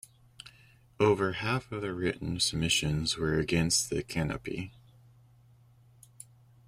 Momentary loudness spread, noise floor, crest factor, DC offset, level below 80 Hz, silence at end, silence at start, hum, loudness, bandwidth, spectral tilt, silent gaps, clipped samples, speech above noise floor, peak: 24 LU; -60 dBFS; 20 dB; under 0.1%; -52 dBFS; 1.95 s; 0.45 s; none; -30 LUFS; 16 kHz; -4 dB/octave; none; under 0.1%; 30 dB; -12 dBFS